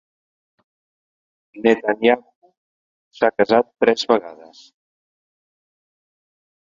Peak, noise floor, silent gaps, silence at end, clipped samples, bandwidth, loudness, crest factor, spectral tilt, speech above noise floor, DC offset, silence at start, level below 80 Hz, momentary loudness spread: 0 dBFS; under -90 dBFS; 2.35-2.42 s, 2.57-3.11 s; 2.35 s; under 0.1%; 7.6 kHz; -18 LUFS; 22 dB; -4.5 dB/octave; over 72 dB; under 0.1%; 1.55 s; -64 dBFS; 5 LU